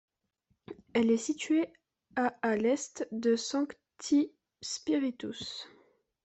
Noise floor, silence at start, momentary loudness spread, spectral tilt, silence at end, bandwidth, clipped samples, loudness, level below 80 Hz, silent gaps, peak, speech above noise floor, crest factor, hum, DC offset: -77 dBFS; 0.7 s; 14 LU; -3.5 dB/octave; 0.6 s; 8.4 kHz; under 0.1%; -32 LUFS; -74 dBFS; none; -16 dBFS; 47 dB; 16 dB; none; under 0.1%